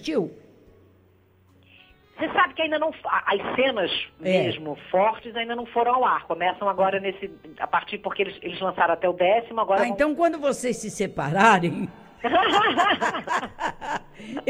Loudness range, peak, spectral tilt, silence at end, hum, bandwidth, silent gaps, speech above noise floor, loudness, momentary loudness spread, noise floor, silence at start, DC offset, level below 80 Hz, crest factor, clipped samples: 4 LU; -4 dBFS; -4.5 dB/octave; 0 s; none; 16 kHz; none; 35 dB; -23 LUFS; 12 LU; -58 dBFS; 0 s; under 0.1%; -58 dBFS; 20 dB; under 0.1%